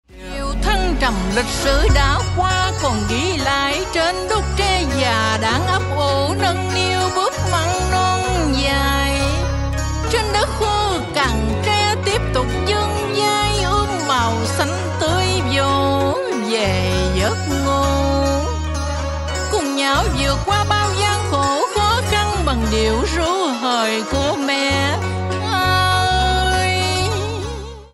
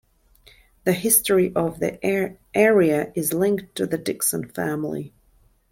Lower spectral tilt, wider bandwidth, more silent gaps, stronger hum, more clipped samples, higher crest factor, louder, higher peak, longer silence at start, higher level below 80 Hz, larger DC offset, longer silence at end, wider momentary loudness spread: about the same, -4.5 dB/octave vs -4.5 dB/octave; second, 13.5 kHz vs 17 kHz; neither; neither; neither; about the same, 14 dB vs 18 dB; first, -18 LUFS vs -21 LUFS; about the same, -2 dBFS vs -4 dBFS; second, 0.1 s vs 0.85 s; first, -26 dBFS vs -56 dBFS; neither; second, 0.05 s vs 0.65 s; second, 4 LU vs 11 LU